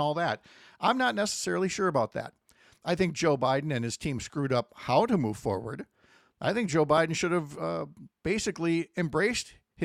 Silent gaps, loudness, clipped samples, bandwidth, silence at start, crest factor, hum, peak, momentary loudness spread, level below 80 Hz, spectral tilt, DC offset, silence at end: none; -29 LUFS; under 0.1%; 15 kHz; 0 s; 18 dB; none; -10 dBFS; 12 LU; -60 dBFS; -5 dB/octave; under 0.1%; 0 s